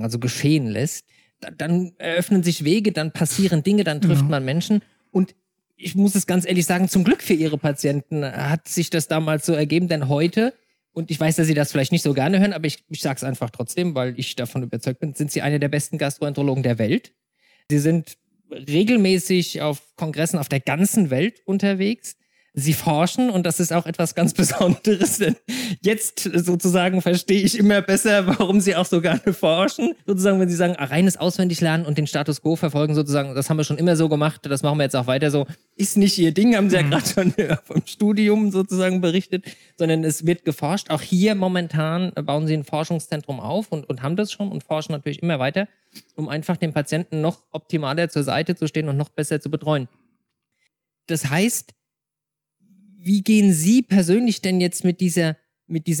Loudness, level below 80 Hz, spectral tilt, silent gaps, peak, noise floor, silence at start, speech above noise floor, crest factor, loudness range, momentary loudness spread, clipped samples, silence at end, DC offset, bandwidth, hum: -21 LUFS; -60 dBFS; -5.5 dB/octave; none; -8 dBFS; -86 dBFS; 0 s; 66 dB; 14 dB; 6 LU; 9 LU; under 0.1%; 0 s; under 0.1%; 19 kHz; none